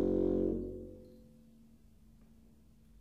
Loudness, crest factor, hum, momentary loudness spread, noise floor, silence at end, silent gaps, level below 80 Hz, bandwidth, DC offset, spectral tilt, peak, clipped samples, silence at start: -35 LUFS; 16 dB; none; 26 LU; -63 dBFS; 1.8 s; none; -52 dBFS; 5.4 kHz; under 0.1%; -10.5 dB/octave; -22 dBFS; under 0.1%; 0 s